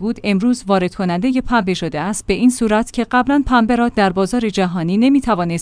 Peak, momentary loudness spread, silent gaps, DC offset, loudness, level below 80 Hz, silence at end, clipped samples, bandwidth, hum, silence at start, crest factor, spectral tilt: -2 dBFS; 5 LU; none; under 0.1%; -16 LUFS; -36 dBFS; 0 s; under 0.1%; 10.5 kHz; none; 0 s; 14 dB; -5.5 dB/octave